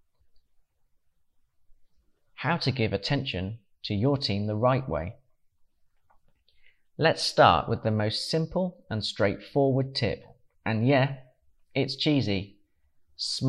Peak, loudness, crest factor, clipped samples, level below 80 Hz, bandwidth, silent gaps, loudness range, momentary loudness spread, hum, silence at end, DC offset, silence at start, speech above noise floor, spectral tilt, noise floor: -6 dBFS; -27 LUFS; 22 dB; under 0.1%; -56 dBFS; 12 kHz; none; 6 LU; 11 LU; none; 0 s; under 0.1%; 2.4 s; 42 dB; -6 dB/octave; -68 dBFS